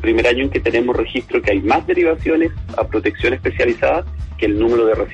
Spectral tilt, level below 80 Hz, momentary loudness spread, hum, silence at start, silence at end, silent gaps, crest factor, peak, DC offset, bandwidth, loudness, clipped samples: -7 dB/octave; -32 dBFS; 6 LU; none; 0 s; 0 s; none; 12 dB; -4 dBFS; under 0.1%; 8.4 kHz; -17 LUFS; under 0.1%